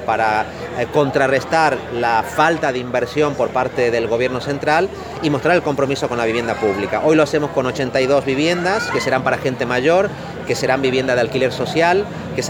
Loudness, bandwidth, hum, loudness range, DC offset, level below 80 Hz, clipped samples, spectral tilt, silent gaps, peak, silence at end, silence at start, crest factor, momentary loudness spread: -18 LUFS; 20 kHz; none; 1 LU; under 0.1%; -46 dBFS; under 0.1%; -5 dB/octave; none; 0 dBFS; 0 s; 0 s; 16 dB; 5 LU